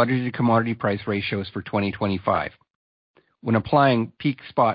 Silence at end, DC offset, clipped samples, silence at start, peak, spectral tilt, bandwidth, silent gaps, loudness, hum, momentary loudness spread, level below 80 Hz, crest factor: 0 s; under 0.1%; under 0.1%; 0 s; -4 dBFS; -11.5 dB/octave; 5.2 kHz; 2.70-3.14 s; -23 LUFS; none; 9 LU; -52 dBFS; 18 dB